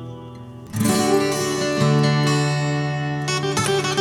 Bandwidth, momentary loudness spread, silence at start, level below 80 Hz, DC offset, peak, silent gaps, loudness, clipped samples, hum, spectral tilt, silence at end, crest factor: 18 kHz; 15 LU; 0 s; -52 dBFS; under 0.1%; -6 dBFS; none; -20 LUFS; under 0.1%; none; -5 dB/octave; 0 s; 14 dB